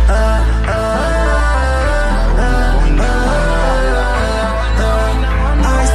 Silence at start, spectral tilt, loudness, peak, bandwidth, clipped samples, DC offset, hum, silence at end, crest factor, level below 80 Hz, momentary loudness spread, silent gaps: 0 s; -5.5 dB/octave; -15 LUFS; -2 dBFS; 12 kHz; under 0.1%; under 0.1%; none; 0 s; 10 dB; -14 dBFS; 2 LU; none